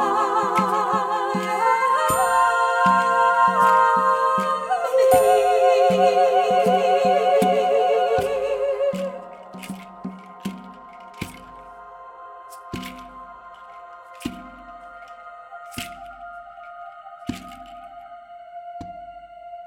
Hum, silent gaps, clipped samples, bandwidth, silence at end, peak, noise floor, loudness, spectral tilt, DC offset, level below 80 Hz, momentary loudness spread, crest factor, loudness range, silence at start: none; none; under 0.1%; 16.5 kHz; 0 s; -4 dBFS; -41 dBFS; -19 LUFS; -4 dB/octave; under 0.1%; -56 dBFS; 24 LU; 18 dB; 20 LU; 0 s